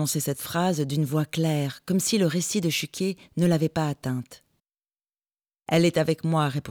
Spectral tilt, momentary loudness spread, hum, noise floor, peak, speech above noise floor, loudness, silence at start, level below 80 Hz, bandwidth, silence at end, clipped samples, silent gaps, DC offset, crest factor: -5 dB/octave; 7 LU; none; under -90 dBFS; -10 dBFS; over 65 dB; -25 LUFS; 0 s; -62 dBFS; over 20 kHz; 0 s; under 0.1%; none; under 0.1%; 16 dB